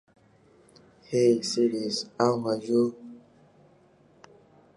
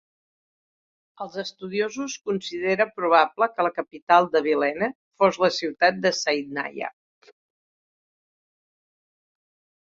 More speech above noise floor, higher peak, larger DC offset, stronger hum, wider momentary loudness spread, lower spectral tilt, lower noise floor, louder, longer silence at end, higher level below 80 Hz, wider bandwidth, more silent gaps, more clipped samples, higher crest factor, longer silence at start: second, 34 dB vs over 67 dB; second, -8 dBFS vs -2 dBFS; neither; neither; second, 8 LU vs 13 LU; about the same, -5 dB/octave vs -4 dB/octave; second, -59 dBFS vs under -90 dBFS; second, -26 LUFS vs -23 LUFS; second, 1.6 s vs 3.1 s; about the same, -74 dBFS vs -70 dBFS; first, 11.5 kHz vs 7.8 kHz; second, none vs 4.02-4.07 s, 4.95-5.11 s; neither; about the same, 22 dB vs 22 dB; about the same, 1.1 s vs 1.2 s